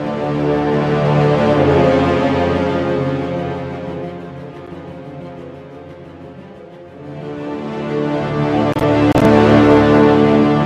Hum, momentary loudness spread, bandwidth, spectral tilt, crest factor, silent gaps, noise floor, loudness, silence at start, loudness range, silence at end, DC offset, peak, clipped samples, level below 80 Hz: none; 24 LU; 9.8 kHz; -8 dB/octave; 16 dB; none; -36 dBFS; -14 LUFS; 0 s; 18 LU; 0 s; under 0.1%; 0 dBFS; under 0.1%; -38 dBFS